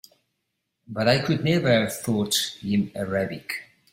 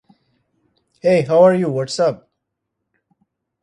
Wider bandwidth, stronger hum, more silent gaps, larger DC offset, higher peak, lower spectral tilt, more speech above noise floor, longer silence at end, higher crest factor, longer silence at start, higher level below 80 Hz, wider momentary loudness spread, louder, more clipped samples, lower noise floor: first, 16 kHz vs 10.5 kHz; neither; neither; neither; second, -6 dBFS vs 0 dBFS; second, -4.5 dB/octave vs -6 dB/octave; second, 55 dB vs 62 dB; second, 0.3 s vs 1.5 s; about the same, 20 dB vs 18 dB; second, 0.9 s vs 1.05 s; first, -58 dBFS vs -64 dBFS; first, 12 LU vs 9 LU; second, -24 LUFS vs -16 LUFS; neither; about the same, -79 dBFS vs -77 dBFS